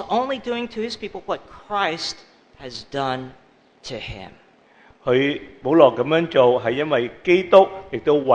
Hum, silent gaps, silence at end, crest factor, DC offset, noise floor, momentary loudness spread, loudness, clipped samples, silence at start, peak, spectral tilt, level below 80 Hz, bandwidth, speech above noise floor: none; none; 0 s; 20 dB; under 0.1%; -53 dBFS; 19 LU; -20 LUFS; under 0.1%; 0 s; 0 dBFS; -5.5 dB/octave; -54 dBFS; 9.4 kHz; 33 dB